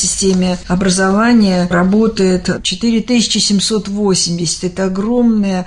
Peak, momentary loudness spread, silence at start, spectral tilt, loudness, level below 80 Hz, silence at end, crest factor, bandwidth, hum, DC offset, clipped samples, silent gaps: -2 dBFS; 6 LU; 0 s; -4.5 dB/octave; -13 LUFS; -36 dBFS; 0 s; 10 dB; 11 kHz; none; under 0.1%; under 0.1%; none